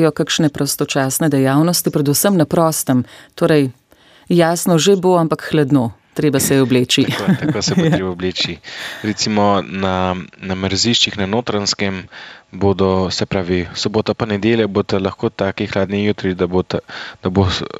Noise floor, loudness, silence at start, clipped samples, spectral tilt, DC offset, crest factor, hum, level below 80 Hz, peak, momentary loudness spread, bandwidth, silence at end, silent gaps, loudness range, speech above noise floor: -49 dBFS; -16 LUFS; 0 s; under 0.1%; -4.5 dB/octave; under 0.1%; 16 dB; none; -46 dBFS; -2 dBFS; 9 LU; 16 kHz; 0.15 s; none; 3 LU; 33 dB